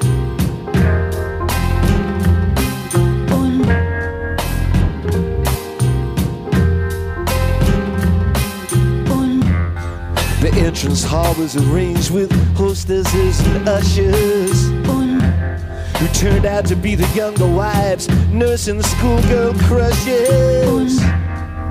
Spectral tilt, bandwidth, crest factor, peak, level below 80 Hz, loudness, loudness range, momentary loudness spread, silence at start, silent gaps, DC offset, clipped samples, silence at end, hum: -6 dB/octave; 16 kHz; 10 dB; -4 dBFS; -22 dBFS; -16 LUFS; 3 LU; 6 LU; 0 s; none; under 0.1%; under 0.1%; 0 s; none